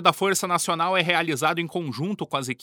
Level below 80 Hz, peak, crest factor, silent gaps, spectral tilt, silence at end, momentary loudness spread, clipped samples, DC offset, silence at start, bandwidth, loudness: -74 dBFS; -4 dBFS; 20 dB; none; -3.5 dB/octave; 0.1 s; 9 LU; under 0.1%; under 0.1%; 0 s; over 20 kHz; -24 LUFS